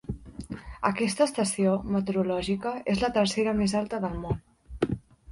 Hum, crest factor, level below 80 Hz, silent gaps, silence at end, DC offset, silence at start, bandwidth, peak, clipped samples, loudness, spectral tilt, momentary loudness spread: none; 18 dB; -46 dBFS; none; 0 s; under 0.1%; 0.1 s; 11.5 kHz; -10 dBFS; under 0.1%; -28 LUFS; -5.5 dB/octave; 13 LU